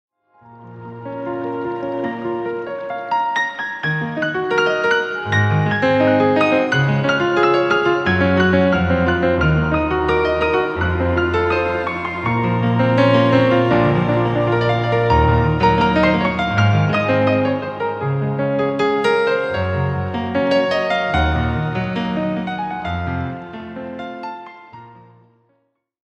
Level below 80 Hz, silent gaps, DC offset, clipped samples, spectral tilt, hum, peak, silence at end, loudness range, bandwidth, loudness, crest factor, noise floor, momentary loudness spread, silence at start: -36 dBFS; none; under 0.1%; under 0.1%; -7.5 dB/octave; none; -2 dBFS; 1.2 s; 8 LU; 8.4 kHz; -17 LUFS; 16 dB; -66 dBFS; 10 LU; 0.5 s